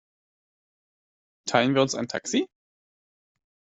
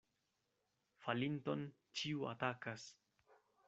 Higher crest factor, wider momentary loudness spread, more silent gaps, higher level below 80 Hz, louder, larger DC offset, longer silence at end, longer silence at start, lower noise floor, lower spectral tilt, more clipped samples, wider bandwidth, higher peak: about the same, 26 dB vs 24 dB; first, 13 LU vs 9 LU; neither; first, -70 dBFS vs -84 dBFS; first, -25 LUFS vs -44 LUFS; neither; first, 1.25 s vs 0.35 s; first, 1.45 s vs 1 s; first, under -90 dBFS vs -86 dBFS; about the same, -4 dB/octave vs -4 dB/octave; neither; about the same, 8.2 kHz vs 8 kHz; first, -4 dBFS vs -22 dBFS